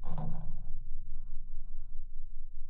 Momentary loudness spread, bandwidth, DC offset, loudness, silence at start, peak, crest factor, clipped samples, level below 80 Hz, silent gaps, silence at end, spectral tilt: 8 LU; 1.2 kHz; under 0.1%; -46 LUFS; 0 s; -18 dBFS; 8 dB; under 0.1%; -34 dBFS; none; 0 s; -10 dB/octave